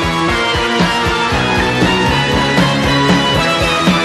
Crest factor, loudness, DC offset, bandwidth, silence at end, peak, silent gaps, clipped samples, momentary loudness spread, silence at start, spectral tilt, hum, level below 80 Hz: 12 dB; -12 LUFS; under 0.1%; 13.5 kHz; 0 s; 0 dBFS; none; under 0.1%; 2 LU; 0 s; -4.5 dB/octave; none; -28 dBFS